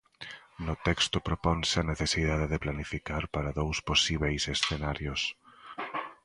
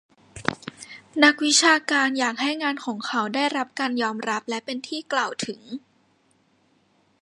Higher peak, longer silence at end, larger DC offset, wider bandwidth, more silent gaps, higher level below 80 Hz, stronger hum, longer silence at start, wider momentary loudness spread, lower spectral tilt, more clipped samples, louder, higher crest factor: second, -8 dBFS vs 0 dBFS; second, 0.1 s vs 1.45 s; neither; about the same, 11.5 kHz vs 11.5 kHz; neither; first, -42 dBFS vs -66 dBFS; neither; second, 0.2 s vs 0.35 s; second, 13 LU vs 17 LU; first, -4 dB/octave vs -1.5 dB/octave; neither; second, -30 LUFS vs -23 LUFS; about the same, 22 dB vs 24 dB